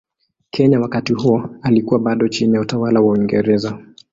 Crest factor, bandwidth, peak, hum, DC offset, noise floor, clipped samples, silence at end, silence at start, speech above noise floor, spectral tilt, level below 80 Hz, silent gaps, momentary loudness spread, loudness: 14 dB; 7.8 kHz; -2 dBFS; none; under 0.1%; -39 dBFS; under 0.1%; 0.3 s; 0.55 s; 24 dB; -7 dB/octave; -52 dBFS; none; 5 LU; -16 LUFS